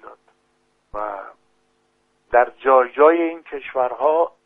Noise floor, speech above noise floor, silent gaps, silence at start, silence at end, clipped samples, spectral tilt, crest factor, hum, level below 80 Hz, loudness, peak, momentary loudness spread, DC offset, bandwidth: -65 dBFS; 48 dB; none; 0.05 s; 0.2 s; under 0.1%; -7 dB/octave; 20 dB; 50 Hz at -80 dBFS; -56 dBFS; -18 LUFS; 0 dBFS; 16 LU; under 0.1%; 3.9 kHz